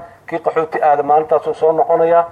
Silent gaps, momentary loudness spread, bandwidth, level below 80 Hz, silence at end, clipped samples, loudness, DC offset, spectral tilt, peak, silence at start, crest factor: none; 7 LU; 8.8 kHz; -60 dBFS; 0 s; under 0.1%; -15 LUFS; under 0.1%; -7 dB/octave; -2 dBFS; 0 s; 12 dB